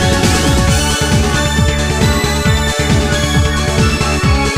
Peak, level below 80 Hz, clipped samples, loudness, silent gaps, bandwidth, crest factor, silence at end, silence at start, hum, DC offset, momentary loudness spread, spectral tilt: 0 dBFS; -18 dBFS; under 0.1%; -13 LUFS; none; 15.5 kHz; 12 dB; 0 s; 0 s; none; under 0.1%; 2 LU; -4.5 dB/octave